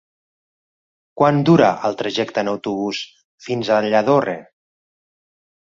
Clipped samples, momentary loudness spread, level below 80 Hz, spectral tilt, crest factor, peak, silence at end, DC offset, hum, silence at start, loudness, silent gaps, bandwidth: under 0.1%; 14 LU; -60 dBFS; -6.5 dB/octave; 18 dB; -2 dBFS; 1.2 s; under 0.1%; none; 1.15 s; -18 LUFS; 3.25-3.38 s; 7.6 kHz